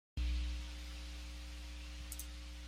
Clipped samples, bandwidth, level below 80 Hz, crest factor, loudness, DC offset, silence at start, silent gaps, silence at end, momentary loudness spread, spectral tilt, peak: under 0.1%; 16 kHz; -44 dBFS; 16 dB; -46 LUFS; under 0.1%; 0.15 s; none; 0 s; 9 LU; -4 dB/octave; -28 dBFS